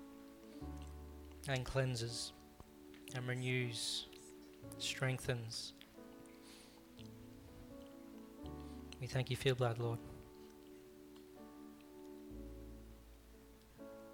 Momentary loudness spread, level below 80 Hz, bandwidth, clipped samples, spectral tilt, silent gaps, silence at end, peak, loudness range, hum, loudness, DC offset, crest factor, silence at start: 20 LU; -60 dBFS; 19 kHz; under 0.1%; -4.5 dB/octave; none; 0 s; -22 dBFS; 14 LU; none; -42 LUFS; under 0.1%; 24 dB; 0 s